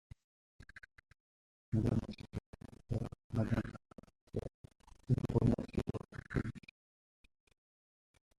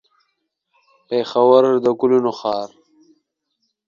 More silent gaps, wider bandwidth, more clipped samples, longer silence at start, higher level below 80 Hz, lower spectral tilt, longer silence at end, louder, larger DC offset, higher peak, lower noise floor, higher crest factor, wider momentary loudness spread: first, 1.20-1.72 s, 2.46-2.53 s, 3.24-3.30 s, 4.21-4.27 s, 4.54-4.64 s vs none; first, 11.5 kHz vs 7.2 kHz; neither; second, 0.6 s vs 1.1 s; first, -54 dBFS vs -68 dBFS; first, -9 dB/octave vs -6.5 dB/octave; first, 1.8 s vs 1.2 s; second, -39 LUFS vs -17 LUFS; neither; second, -18 dBFS vs 0 dBFS; first, under -90 dBFS vs -73 dBFS; about the same, 24 dB vs 20 dB; first, 22 LU vs 12 LU